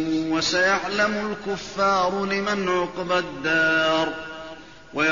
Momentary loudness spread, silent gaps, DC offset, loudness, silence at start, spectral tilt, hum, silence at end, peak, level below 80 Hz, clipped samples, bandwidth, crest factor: 14 LU; none; 0.3%; -22 LUFS; 0 s; -2 dB/octave; none; 0 s; -10 dBFS; -54 dBFS; under 0.1%; 7.4 kHz; 14 dB